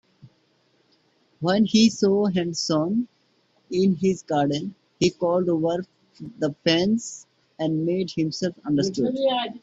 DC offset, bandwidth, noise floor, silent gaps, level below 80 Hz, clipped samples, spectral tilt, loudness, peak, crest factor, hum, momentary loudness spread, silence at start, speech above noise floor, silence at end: under 0.1%; 8 kHz; -65 dBFS; none; -62 dBFS; under 0.1%; -5.5 dB/octave; -23 LUFS; -6 dBFS; 18 dB; none; 11 LU; 0.25 s; 42 dB; 0.05 s